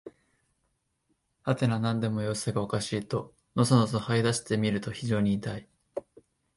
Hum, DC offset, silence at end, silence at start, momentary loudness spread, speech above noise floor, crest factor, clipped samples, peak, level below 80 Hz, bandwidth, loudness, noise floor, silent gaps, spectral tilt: none; under 0.1%; 0.55 s; 0.05 s; 14 LU; 49 dB; 20 dB; under 0.1%; -10 dBFS; -58 dBFS; 11.5 kHz; -29 LUFS; -76 dBFS; none; -6 dB/octave